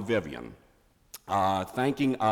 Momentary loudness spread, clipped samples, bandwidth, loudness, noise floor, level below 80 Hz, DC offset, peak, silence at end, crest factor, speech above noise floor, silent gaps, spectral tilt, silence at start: 20 LU; under 0.1%; 18 kHz; -28 LUFS; -63 dBFS; -60 dBFS; under 0.1%; -14 dBFS; 0 s; 16 dB; 36 dB; none; -6 dB/octave; 0 s